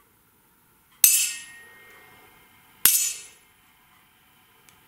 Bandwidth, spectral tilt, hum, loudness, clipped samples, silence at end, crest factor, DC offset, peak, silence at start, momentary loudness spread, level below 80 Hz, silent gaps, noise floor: 16 kHz; 3 dB/octave; none; -19 LUFS; under 0.1%; 1.6 s; 28 dB; under 0.1%; 0 dBFS; 1.05 s; 20 LU; -66 dBFS; none; -61 dBFS